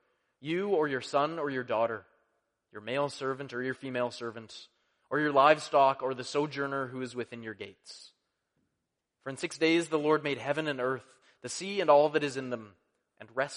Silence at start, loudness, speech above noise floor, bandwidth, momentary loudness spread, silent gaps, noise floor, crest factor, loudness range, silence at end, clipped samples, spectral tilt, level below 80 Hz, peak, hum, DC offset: 0.4 s; -30 LUFS; 54 dB; 10.5 kHz; 21 LU; none; -84 dBFS; 24 dB; 8 LU; 0 s; under 0.1%; -4.5 dB/octave; -78 dBFS; -8 dBFS; none; under 0.1%